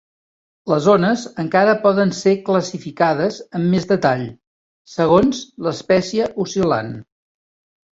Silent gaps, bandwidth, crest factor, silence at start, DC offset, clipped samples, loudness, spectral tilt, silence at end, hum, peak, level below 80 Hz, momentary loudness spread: 4.47-4.85 s; 8 kHz; 16 dB; 0.65 s; under 0.1%; under 0.1%; -18 LUFS; -6 dB/octave; 0.9 s; none; -2 dBFS; -52 dBFS; 10 LU